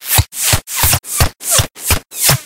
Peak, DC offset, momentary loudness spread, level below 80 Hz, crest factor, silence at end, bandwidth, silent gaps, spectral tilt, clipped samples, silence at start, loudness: 0 dBFS; under 0.1%; 4 LU; -26 dBFS; 14 dB; 0 s; 17 kHz; none; -2 dB/octave; under 0.1%; 0 s; -13 LUFS